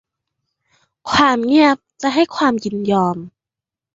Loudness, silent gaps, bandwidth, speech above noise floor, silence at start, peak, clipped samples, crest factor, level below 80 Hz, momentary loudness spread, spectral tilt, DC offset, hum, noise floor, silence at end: -16 LUFS; none; 7.8 kHz; 72 dB; 1.05 s; -2 dBFS; under 0.1%; 16 dB; -52 dBFS; 8 LU; -5 dB/octave; under 0.1%; none; -87 dBFS; 0.65 s